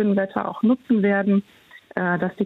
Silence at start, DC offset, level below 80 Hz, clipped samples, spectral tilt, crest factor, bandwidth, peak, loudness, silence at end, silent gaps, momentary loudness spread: 0 s; under 0.1%; -66 dBFS; under 0.1%; -9.5 dB/octave; 12 dB; 4.1 kHz; -10 dBFS; -22 LUFS; 0 s; none; 7 LU